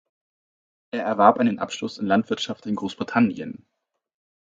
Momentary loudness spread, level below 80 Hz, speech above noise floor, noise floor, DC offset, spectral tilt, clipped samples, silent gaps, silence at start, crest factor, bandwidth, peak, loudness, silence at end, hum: 16 LU; -64 dBFS; over 68 dB; under -90 dBFS; under 0.1%; -5.5 dB/octave; under 0.1%; none; 0.95 s; 24 dB; 7.6 kHz; 0 dBFS; -23 LUFS; 0.9 s; none